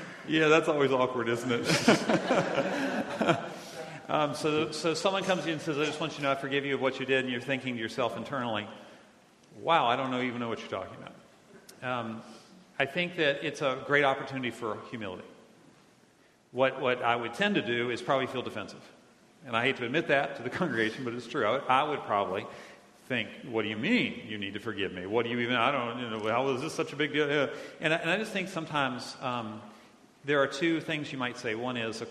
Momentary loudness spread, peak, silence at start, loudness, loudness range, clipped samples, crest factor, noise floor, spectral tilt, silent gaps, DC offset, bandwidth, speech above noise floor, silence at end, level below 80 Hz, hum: 12 LU; -6 dBFS; 0 s; -30 LUFS; 4 LU; under 0.1%; 24 dB; -62 dBFS; -4.5 dB/octave; none; under 0.1%; 13 kHz; 32 dB; 0 s; -72 dBFS; none